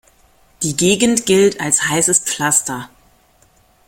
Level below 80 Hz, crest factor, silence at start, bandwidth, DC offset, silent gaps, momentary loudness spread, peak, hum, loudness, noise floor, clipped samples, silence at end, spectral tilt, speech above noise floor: -52 dBFS; 18 dB; 0.6 s; 16.5 kHz; under 0.1%; none; 9 LU; 0 dBFS; none; -14 LUFS; -54 dBFS; under 0.1%; 1 s; -3 dB/octave; 38 dB